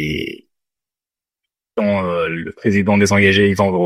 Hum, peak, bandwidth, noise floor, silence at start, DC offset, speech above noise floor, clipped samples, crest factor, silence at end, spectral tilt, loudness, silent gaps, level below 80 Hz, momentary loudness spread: none; 0 dBFS; 14 kHz; -90 dBFS; 0 s; under 0.1%; 74 dB; under 0.1%; 18 dB; 0 s; -5.5 dB/octave; -16 LUFS; none; -46 dBFS; 12 LU